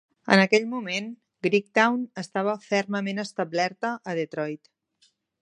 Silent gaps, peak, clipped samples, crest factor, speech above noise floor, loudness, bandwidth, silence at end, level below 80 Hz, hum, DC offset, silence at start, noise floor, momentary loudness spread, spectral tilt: none; -2 dBFS; under 0.1%; 24 dB; 41 dB; -25 LUFS; 10.5 kHz; 0.85 s; -74 dBFS; none; under 0.1%; 0.25 s; -67 dBFS; 11 LU; -5 dB/octave